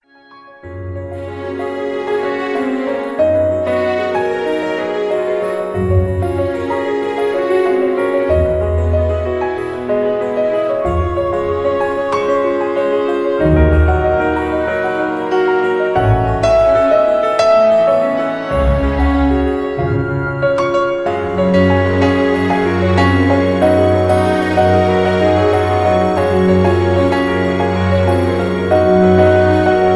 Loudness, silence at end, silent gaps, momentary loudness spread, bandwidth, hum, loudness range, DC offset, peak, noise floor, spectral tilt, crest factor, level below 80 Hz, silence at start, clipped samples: -14 LUFS; 0 s; none; 7 LU; 11 kHz; none; 4 LU; under 0.1%; 0 dBFS; -42 dBFS; -7.5 dB/octave; 12 dB; -28 dBFS; 0.35 s; under 0.1%